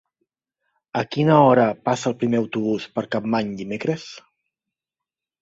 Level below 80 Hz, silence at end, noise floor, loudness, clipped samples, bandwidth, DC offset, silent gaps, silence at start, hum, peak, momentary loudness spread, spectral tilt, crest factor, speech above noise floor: -62 dBFS; 1.2 s; -88 dBFS; -21 LUFS; under 0.1%; 8 kHz; under 0.1%; none; 0.95 s; none; -2 dBFS; 13 LU; -6.5 dB/octave; 20 dB; 68 dB